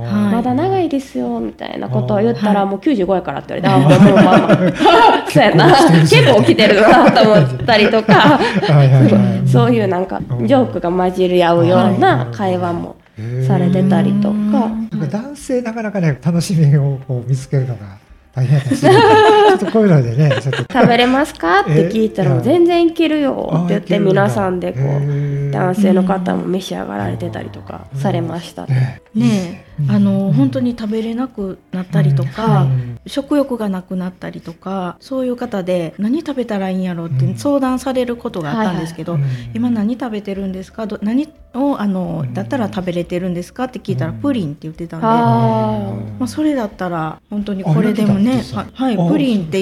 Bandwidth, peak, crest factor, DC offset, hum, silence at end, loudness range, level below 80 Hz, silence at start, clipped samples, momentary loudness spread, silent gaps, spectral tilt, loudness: 13.5 kHz; 0 dBFS; 14 dB; under 0.1%; none; 0 s; 11 LU; -46 dBFS; 0 s; 0.1%; 14 LU; none; -7 dB/octave; -14 LUFS